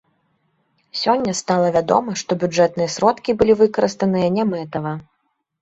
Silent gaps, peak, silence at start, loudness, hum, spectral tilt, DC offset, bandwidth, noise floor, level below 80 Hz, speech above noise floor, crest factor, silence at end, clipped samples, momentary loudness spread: none; -2 dBFS; 0.95 s; -18 LUFS; none; -5 dB/octave; under 0.1%; 8.2 kHz; -66 dBFS; -52 dBFS; 48 dB; 18 dB; 0.6 s; under 0.1%; 10 LU